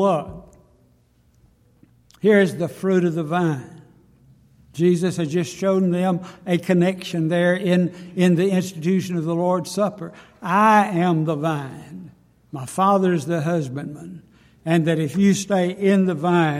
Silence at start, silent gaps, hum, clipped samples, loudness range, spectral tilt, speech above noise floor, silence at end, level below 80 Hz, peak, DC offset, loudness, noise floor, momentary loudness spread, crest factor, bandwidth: 0 s; none; none; under 0.1%; 3 LU; -6.5 dB/octave; 39 dB; 0 s; -60 dBFS; -4 dBFS; under 0.1%; -20 LUFS; -58 dBFS; 16 LU; 18 dB; 13.5 kHz